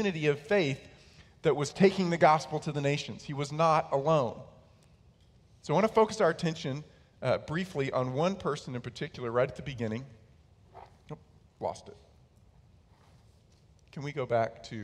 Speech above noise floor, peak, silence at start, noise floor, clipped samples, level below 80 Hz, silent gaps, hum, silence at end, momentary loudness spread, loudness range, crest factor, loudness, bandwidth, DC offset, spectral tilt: 32 dB; -10 dBFS; 0 s; -61 dBFS; under 0.1%; -62 dBFS; none; none; 0 s; 16 LU; 16 LU; 22 dB; -30 LUFS; 12 kHz; under 0.1%; -6 dB/octave